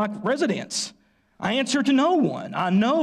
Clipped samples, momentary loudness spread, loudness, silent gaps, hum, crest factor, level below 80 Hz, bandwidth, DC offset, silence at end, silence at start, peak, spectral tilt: under 0.1%; 9 LU; -23 LUFS; none; none; 10 dB; -66 dBFS; 12.5 kHz; under 0.1%; 0 s; 0 s; -12 dBFS; -4.5 dB/octave